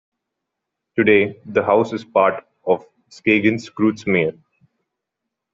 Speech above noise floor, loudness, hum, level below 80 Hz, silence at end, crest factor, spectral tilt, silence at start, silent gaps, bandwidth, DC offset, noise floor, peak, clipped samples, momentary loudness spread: 63 dB; -19 LUFS; none; -60 dBFS; 1.2 s; 18 dB; -6.5 dB/octave; 0.95 s; none; 7.6 kHz; under 0.1%; -81 dBFS; -2 dBFS; under 0.1%; 8 LU